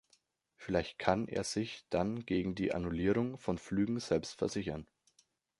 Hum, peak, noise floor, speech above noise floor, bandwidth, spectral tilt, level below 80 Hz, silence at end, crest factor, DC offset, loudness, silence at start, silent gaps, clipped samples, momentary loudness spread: none; -12 dBFS; -74 dBFS; 39 dB; 11.5 kHz; -5.5 dB/octave; -56 dBFS; 0.75 s; 24 dB; under 0.1%; -35 LUFS; 0.6 s; none; under 0.1%; 6 LU